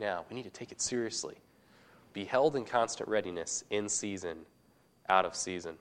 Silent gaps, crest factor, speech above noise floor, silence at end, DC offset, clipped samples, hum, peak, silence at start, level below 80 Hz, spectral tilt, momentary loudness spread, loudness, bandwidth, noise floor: none; 24 dB; 33 dB; 0.05 s; under 0.1%; under 0.1%; none; -10 dBFS; 0 s; -72 dBFS; -2.5 dB/octave; 15 LU; -33 LUFS; 12.5 kHz; -67 dBFS